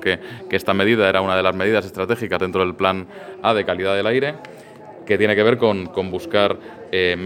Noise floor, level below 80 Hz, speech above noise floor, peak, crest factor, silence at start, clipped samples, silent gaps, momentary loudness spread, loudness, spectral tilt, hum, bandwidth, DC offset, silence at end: -39 dBFS; -56 dBFS; 20 dB; 0 dBFS; 20 dB; 0 s; under 0.1%; none; 10 LU; -19 LUFS; -6 dB/octave; none; 16.5 kHz; under 0.1%; 0 s